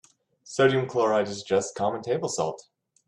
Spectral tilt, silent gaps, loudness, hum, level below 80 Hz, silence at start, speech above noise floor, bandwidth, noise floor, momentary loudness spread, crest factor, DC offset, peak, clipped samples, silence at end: -4.5 dB/octave; none; -26 LUFS; none; -68 dBFS; 0.45 s; 26 dB; 11 kHz; -52 dBFS; 9 LU; 20 dB; under 0.1%; -8 dBFS; under 0.1%; 0.45 s